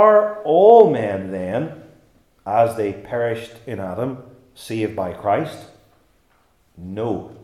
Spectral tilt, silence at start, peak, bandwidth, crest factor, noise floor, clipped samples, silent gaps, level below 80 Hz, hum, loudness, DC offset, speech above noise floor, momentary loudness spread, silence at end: -7 dB/octave; 0 s; 0 dBFS; 13 kHz; 20 dB; -60 dBFS; under 0.1%; none; -60 dBFS; none; -19 LUFS; under 0.1%; 42 dB; 21 LU; 0.1 s